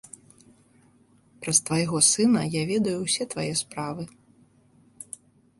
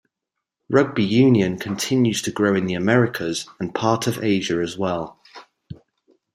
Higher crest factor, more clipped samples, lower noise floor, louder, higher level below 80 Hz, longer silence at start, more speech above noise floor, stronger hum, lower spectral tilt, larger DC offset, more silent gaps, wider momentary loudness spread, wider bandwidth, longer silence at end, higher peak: about the same, 22 dB vs 20 dB; neither; second, -60 dBFS vs -83 dBFS; second, -23 LUFS vs -20 LUFS; about the same, -62 dBFS vs -58 dBFS; first, 1.4 s vs 0.7 s; second, 35 dB vs 63 dB; neither; second, -3.5 dB/octave vs -5.5 dB/octave; neither; neither; first, 22 LU vs 10 LU; second, 12 kHz vs 15.5 kHz; about the same, 0.55 s vs 0.6 s; second, -6 dBFS vs -2 dBFS